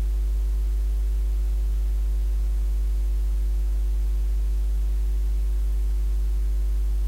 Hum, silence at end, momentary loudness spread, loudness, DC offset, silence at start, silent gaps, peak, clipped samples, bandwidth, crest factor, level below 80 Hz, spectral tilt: none; 0 s; 0 LU; -27 LUFS; under 0.1%; 0 s; none; -18 dBFS; under 0.1%; 4.7 kHz; 4 dB; -22 dBFS; -6.5 dB/octave